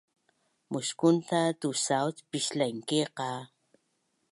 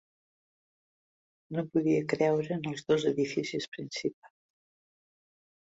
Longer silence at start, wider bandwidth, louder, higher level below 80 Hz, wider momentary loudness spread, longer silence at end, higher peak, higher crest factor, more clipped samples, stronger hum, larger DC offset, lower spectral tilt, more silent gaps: second, 0.7 s vs 1.5 s; first, 11.5 kHz vs 8 kHz; about the same, -30 LUFS vs -31 LUFS; second, -82 dBFS vs -72 dBFS; about the same, 10 LU vs 9 LU; second, 0.85 s vs 1.5 s; first, -10 dBFS vs -14 dBFS; about the same, 20 dB vs 20 dB; neither; neither; neither; second, -4 dB/octave vs -6 dB/octave; second, none vs 3.68-3.72 s, 4.13-4.22 s